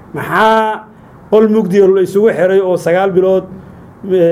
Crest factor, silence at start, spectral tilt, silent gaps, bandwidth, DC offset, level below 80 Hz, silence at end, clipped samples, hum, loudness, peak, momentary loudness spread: 12 dB; 0.15 s; -7 dB/octave; none; 15 kHz; under 0.1%; -50 dBFS; 0 s; under 0.1%; none; -11 LUFS; 0 dBFS; 8 LU